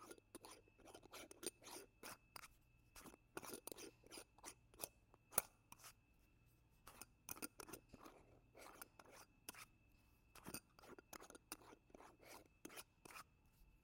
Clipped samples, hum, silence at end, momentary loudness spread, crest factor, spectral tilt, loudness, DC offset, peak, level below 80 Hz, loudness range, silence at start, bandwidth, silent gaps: under 0.1%; none; 0 s; 12 LU; 40 dB; -2 dB/octave; -55 LUFS; under 0.1%; -18 dBFS; -78 dBFS; 9 LU; 0 s; 16.5 kHz; none